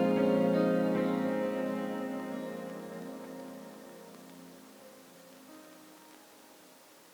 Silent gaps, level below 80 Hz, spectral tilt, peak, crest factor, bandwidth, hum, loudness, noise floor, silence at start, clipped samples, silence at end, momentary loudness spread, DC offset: none; -74 dBFS; -7 dB/octave; -16 dBFS; 18 dB; over 20 kHz; none; -32 LUFS; -57 dBFS; 0 s; under 0.1%; 0.45 s; 26 LU; under 0.1%